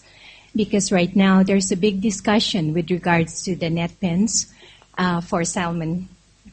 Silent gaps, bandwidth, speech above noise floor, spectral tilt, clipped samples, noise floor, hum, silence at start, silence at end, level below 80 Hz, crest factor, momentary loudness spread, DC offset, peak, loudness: none; 8.8 kHz; 27 dB; -4.5 dB/octave; under 0.1%; -47 dBFS; none; 0.25 s; 0 s; -50 dBFS; 18 dB; 10 LU; under 0.1%; -2 dBFS; -20 LUFS